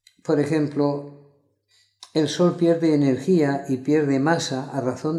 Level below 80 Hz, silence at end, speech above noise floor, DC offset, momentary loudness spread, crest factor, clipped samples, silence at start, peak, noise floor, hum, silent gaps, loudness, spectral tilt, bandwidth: -70 dBFS; 0 s; 43 dB; under 0.1%; 7 LU; 16 dB; under 0.1%; 0.25 s; -6 dBFS; -64 dBFS; none; none; -22 LUFS; -6.5 dB/octave; 12 kHz